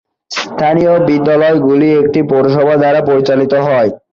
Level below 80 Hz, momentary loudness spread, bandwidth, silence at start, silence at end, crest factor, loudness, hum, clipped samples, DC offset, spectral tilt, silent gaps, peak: -50 dBFS; 4 LU; 7.4 kHz; 0.3 s; 0.15 s; 10 dB; -11 LUFS; none; under 0.1%; under 0.1%; -7 dB/octave; none; 0 dBFS